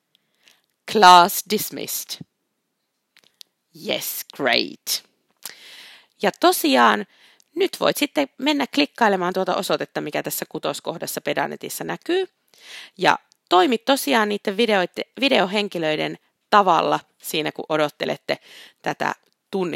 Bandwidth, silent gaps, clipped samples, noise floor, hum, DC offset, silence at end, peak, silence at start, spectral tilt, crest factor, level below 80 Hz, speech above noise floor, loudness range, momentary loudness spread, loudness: 16.5 kHz; none; under 0.1%; -75 dBFS; none; under 0.1%; 0 s; 0 dBFS; 0.85 s; -3 dB/octave; 22 dB; -72 dBFS; 55 dB; 7 LU; 16 LU; -20 LUFS